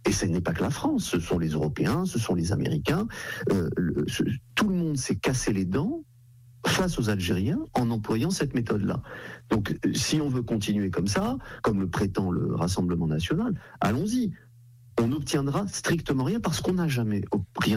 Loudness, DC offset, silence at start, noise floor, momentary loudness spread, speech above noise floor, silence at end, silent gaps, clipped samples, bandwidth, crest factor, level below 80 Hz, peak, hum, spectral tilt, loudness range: -27 LUFS; under 0.1%; 0.05 s; -53 dBFS; 4 LU; 26 dB; 0 s; none; under 0.1%; 16 kHz; 12 dB; -48 dBFS; -14 dBFS; none; -5.5 dB/octave; 1 LU